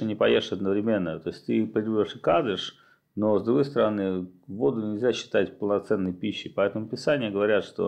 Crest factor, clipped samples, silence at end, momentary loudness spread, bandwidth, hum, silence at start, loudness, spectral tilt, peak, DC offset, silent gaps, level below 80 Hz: 16 dB; under 0.1%; 0 s; 8 LU; 9.8 kHz; none; 0 s; -26 LUFS; -6.5 dB/octave; -10 dBFS; under 0.1%; none; -66 dBFS